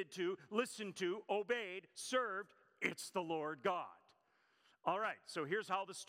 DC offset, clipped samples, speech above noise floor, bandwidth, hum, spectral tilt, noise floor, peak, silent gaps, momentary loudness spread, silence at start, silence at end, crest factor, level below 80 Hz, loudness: under 0.1%; under 0.1%; 35 dB; 16 kHz; none; -3.5 dB/octave; -77 dBFS; -20 dBFS; none; 6 LU; 0 s; 0.05 s; 22 dB; under -90 dBFS; -42 LUFS